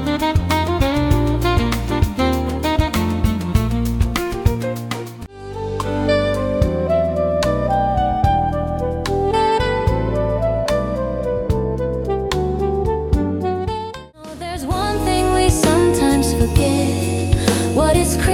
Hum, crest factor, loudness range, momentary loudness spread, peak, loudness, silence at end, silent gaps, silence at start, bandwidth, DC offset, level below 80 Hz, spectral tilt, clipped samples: none; 16 dB; 4 LU; 8 LU; -2 dBFS; -18 LUFS; 0 s; none; 0 s; 18 kHz; under 0.1%; -26 dBFS; -6 dB/octave; under 0.1%